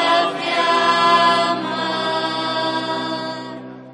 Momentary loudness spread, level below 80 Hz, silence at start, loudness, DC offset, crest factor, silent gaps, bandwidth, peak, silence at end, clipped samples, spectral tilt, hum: 13 LU; -68 dBFS; 0 s; -18 LUFS; under 0.1%; 16 dB; none; 10.5 kHz; -2 dBFS; 0 s; under 0.1%; -3.5 dB/octave; none